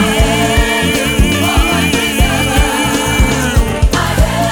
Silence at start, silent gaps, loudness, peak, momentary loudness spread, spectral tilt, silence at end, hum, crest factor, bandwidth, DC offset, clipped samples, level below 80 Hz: 0 s; none; -12 LUFS; 0 dBFS; 2 LU; -4 dB/octave; 0 s; none; 12 dB; 19.5 kHz; under 0.1%; under 0.1%; -16 dBFS